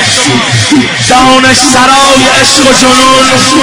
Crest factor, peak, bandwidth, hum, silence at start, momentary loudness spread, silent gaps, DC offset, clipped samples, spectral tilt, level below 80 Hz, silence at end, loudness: 4 dB; 0 dBFS; 12 kHz; none; 0 s; 3 LU; none; under 0.1%; 10%; -2.5 dB/octave; -32 dBFS; 0 s; -3 LUFS